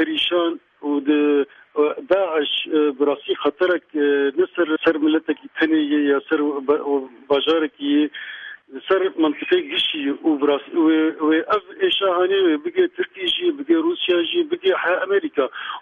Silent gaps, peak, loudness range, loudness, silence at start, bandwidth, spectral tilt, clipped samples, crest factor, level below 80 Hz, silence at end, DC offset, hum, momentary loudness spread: none; -6 dBFS; 2 LU; -20 LUFS; 0 s; 4.5 kHz; -5.5 dB/octave; under 0.1%; 14 dB; -68 dBFS; 0 s; under 0.1%; none; 6 LU